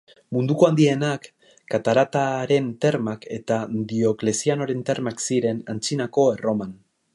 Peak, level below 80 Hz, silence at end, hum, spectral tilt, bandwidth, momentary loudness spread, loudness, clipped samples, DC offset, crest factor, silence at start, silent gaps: -4 dBFS; -64 dBFS; 0.4 s; none; -5.5 dB/octave; 11.5 kHz; 9 LU; -22 LUFS; under 0.1%; under 0.1%; 18 dB; 0.3 s; none